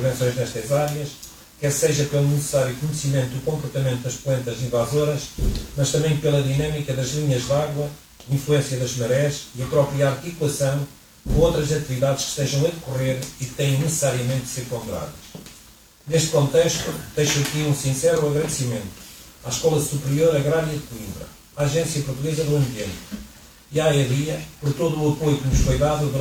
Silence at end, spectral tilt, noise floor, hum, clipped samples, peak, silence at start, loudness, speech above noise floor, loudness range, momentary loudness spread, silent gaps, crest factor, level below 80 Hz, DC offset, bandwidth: 0 s; -5 dB/octave; -49 dBFS; none; under 0.1%; -6 dBFS; 0 s; -22 LUFS; 27 dB; 2 LU; 12 LU; none; 16 dB; -38 dBFS; under 0.1%; 16.5 kHz